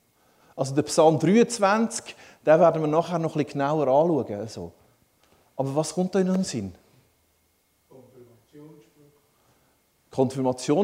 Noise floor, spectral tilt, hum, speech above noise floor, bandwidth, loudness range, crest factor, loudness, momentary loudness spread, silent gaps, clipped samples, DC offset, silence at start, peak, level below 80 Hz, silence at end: -67 dBFS; -6 dB/octave; none; 45 dB; 15.5 kHz; 11 LU; 18 dB; -23 LUFS; 17 LU; none; under 0.1%; under 0.1%; 0.55 s; -6 dBFS; -68 dBFS; 0 s